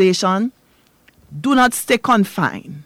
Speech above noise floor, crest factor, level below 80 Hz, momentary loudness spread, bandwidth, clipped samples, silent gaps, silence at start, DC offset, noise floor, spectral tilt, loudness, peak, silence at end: 39 dB; 12 dB; -54 dBFS; 10 LU; 16.5 kHz; under 0.1%; none; 0 s; under 0.1%; -56 dBFS; -4.5 dB/octave; -17 LUFS; -6 dBFS; 0.05 s